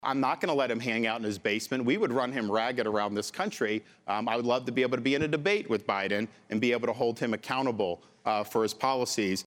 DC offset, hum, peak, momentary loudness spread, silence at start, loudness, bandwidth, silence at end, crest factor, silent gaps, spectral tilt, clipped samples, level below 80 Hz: under 0.1%; none; -12 dBFS; 5 LU; 0 s; -29 LUFS; 17 kHz; 0.05 s; 18 dB; none; -4.5 dB/octave; under 0.1%; -70 dBFS